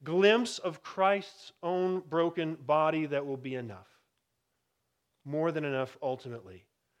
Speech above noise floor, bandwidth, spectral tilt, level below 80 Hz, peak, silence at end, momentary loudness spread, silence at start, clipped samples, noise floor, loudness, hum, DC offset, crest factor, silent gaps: 50 dB; 12 kHz; -5.5 dB/octave; -82 dBFS; -12 dBFS; 0.4 s; 14 LU; 0 s; under 0.1%; -81 dBFS; -31 LUFS; none; under 0.1%; 20 dB; none